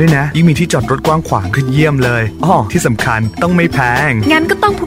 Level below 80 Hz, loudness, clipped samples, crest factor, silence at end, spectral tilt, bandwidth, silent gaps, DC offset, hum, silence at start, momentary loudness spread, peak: -32 dBFS; -12 LUFS; under 0.1%; 12 dB; 0 s; -6 dB/octave; 16.5 kHz; none; under 0.1%; none; 0 s; 4 LU; 0 dBFS